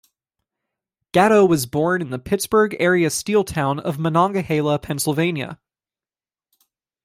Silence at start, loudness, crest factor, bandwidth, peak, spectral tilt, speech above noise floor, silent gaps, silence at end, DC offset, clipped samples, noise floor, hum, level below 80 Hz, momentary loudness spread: 1.15 s; -19 LUFS; 18 dB; 16 kHz; -2 dBFS; -5 dB/octave; over 71 dB; none; 1.5 s; under 0.1%; under 0.1%; under -90 dBFS; none; -54 dBFS; 8 LU